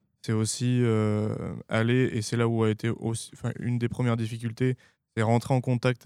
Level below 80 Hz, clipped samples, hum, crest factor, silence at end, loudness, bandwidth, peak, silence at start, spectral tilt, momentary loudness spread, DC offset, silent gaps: -60 dBFS; under 0.1%; none; 18 dB; 0.1 s; -27 LUFS; 12.5 kHz; -8 dBFS; 0.25 s; -6.5 dB/octave; 8 LU; under 0.1%; none